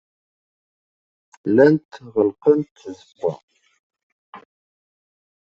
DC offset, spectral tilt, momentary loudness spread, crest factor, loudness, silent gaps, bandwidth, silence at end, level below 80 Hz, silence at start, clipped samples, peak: under 0.1%; -8.5 dB/octave; 22 LU; 20 dB; -19 LUFS; 1.85-1.89 s, 2.71-2.75 s, 3.43-3.48 s, 3.79-3.90 s, 4.03-4.33 s; 7.4 kHz; 1.15 s; -66 dBFS; 1.45 s; under 0.1%; -2 dBFS